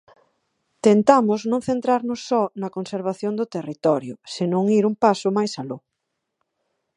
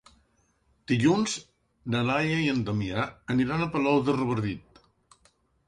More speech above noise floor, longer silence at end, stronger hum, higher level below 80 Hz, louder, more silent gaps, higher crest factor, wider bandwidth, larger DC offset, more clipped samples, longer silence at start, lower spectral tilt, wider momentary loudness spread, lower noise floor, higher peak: first, 58 dB vs 42 dB; about the same, 1.2 s vs 1.1 s; neither; second, -66 dBFS vs -56 dBFS; first, -21 LUFS vs -27 LUFS; neither; about the same, 22 dB vs 18 dB; about the same, 10.5 kHz vs 11 kHz; neither; neither; about the same, 0.85 s vs 0.9 s; about the same, -6.5 dB/octave vs -5.5 dB/octave; first, 12 LU vs 8 LU; first, -79 dBFS vs -68 dBFS; first, 0 dBFS vs -10 dBFS